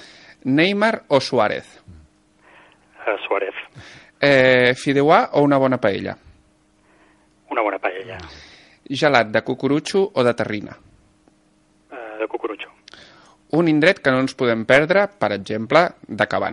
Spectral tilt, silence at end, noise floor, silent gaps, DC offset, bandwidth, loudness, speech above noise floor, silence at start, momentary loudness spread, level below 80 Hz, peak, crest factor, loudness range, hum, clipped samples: -5.5 dB/octave; 0 s; -59 dBFS; none; under 0.1%; 11.5 kHz; -19 LUFS; 40 dB; 0.45 s; 17 LU; -58 dBFS; 0 dBFS; 20 dB; 8 LU; none; under 0.1%